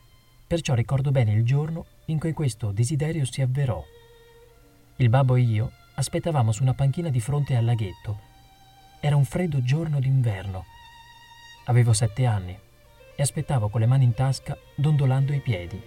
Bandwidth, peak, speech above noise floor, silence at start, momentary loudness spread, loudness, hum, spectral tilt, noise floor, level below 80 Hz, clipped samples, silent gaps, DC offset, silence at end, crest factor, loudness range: 13 kHz; -8 dBFS; 31 dB; 0.5 s; 11 LU; -24 LUFS; none; -6.5 dB/octave; -54 dBFS; -48 dBFS; under 0.1%; none; under 0.1%; 0 s; 16 dB; 3 LU